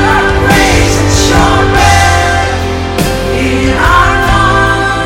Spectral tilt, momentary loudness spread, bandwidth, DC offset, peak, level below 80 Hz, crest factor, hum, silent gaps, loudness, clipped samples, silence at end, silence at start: -4.5 dB/octave; 6 LU; 17 kHz; under 0.1%; 0 dBFS; -18 dBFS; 8 dB; none; none; -8 LUFS; 0.9%; 0 s; 0 s